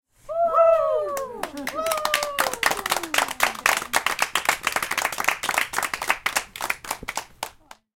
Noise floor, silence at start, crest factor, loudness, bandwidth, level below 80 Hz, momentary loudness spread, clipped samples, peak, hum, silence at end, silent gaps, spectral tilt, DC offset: -45 dBFS; 0.25 s; 24 dB; -23 LUFS; 17 kHz; -54 dBFS; 11 LU; under 0.1%; 0 dBFS; none; 0.5 s; none; -0.5 dB/octave; under 0.1%